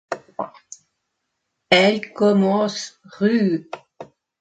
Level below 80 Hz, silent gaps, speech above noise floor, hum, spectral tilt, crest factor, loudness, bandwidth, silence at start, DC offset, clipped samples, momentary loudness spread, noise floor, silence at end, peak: -66 dBFS; none; 58 dB; none; -5 dB/octave; 22 dB; -19 LUFS; 9 kHz; 0.1 s; under 0.1%; under 0.1%; 18 LU; -76 dBFS; 0.35 s; 0 dBFS